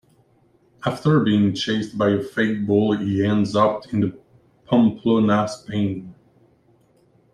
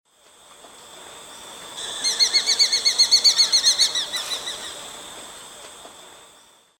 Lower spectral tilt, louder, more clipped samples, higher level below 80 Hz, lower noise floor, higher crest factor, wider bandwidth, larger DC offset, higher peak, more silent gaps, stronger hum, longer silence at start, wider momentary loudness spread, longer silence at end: first, -7 dB/octave vs 2.5 dB/octave; second, -20 LUFS vs -17 LUFS; neither; first, -58 dBFS vs -64 dBFS; first, -59 dBFS vs -53 dBFS; about the same, 18 dB vs 18 dB; second, 10.5 kHz vs 18 kHz; neither; about the same, -4 dBFS vs -6 dBFS; neither; neither; first, 0.85 s vs 0.65 s; second, 8 LU vs 25 LU; first, 1.2 s vs 0.7 s